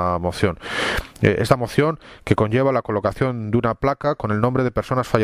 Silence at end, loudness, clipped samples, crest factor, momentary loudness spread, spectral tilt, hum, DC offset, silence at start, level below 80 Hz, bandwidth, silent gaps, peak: 0 s; -21 LUFS; under 0.1%; 20 dB; 5 LU; -6.5 dB/octave; none; under 0.1%; 0 s; -40 dBFS; 15.5 kHz; none; 0 dBFS